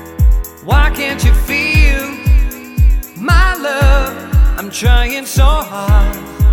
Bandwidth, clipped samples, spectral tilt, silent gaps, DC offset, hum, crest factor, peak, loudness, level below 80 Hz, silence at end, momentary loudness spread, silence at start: 19 kHz; under 0.1%; -5 dB/octave; none; under 0.1%; none; 10 dB; 0 dBFS; -14 LUFS; -12 dBFS; 0 s; 4 LU; 0 s